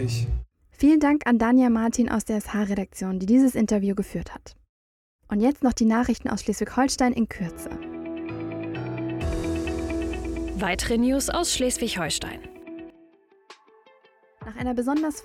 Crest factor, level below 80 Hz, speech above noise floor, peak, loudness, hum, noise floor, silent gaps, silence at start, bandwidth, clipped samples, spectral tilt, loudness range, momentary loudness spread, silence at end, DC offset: 16 dB; -40 dBFS; 35 dB; -8 dBFS; -24 LUFS; none; -58 dBFS; 4.69-5.19 s; 0 s; 16 kHz; under 0.1%; -5 dB/octave; 8 LU; 15 LU; 0 s; under 0.1%